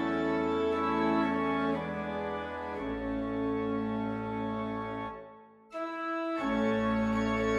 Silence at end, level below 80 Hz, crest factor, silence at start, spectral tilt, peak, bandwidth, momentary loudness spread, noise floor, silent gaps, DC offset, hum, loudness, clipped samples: 0 s; -52 dBFS; 14 dB; 0 s; -7 dB/octave; -18 dBFS; 9.4 kHz; 9 LU; -53 dBFS; none; under 0.1%; none; -32 LUFS; under 0.1%